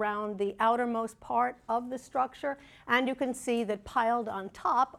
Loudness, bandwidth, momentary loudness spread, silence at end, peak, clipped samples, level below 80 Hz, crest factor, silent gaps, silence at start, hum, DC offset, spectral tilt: -31 LUFS; 14.5 kHz; 7 LU; 0 s; -12 dBFS; under 0.1%; -64 dBFS; 18 dB; none; 0 s; none; under 0.1%; -4 dB/octave